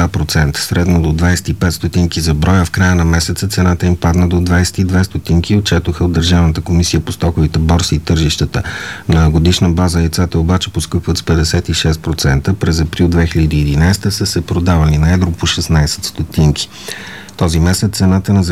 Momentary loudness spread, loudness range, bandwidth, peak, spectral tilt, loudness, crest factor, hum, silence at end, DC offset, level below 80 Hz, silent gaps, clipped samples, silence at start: 5 LU; 1 LU; 15 kHz; 0 dBFS; -5.5 dB/octave; -13 LUFS; 12 dB; none; 0 s; 0.7%; -22 dBFS; none; under 0.1%; 0 s